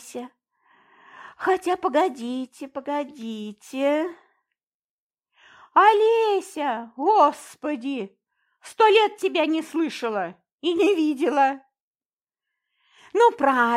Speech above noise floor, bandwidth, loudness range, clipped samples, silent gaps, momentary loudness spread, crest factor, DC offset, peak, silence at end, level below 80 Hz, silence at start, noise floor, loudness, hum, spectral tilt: over 68 dB; 15 kHz; 6 LU; under 0.1%; 4.63-5.10 s, 10.52-10.59 s, 11.81-11.94 s, 12.06-12.17 s; 17 LU; 20 dB; under 0.1%; -4 dBFS; 0 s; -76 dBFS; 0.05 s; under -90 dBFS; -22 LUFS; none; -3.5 dB/octave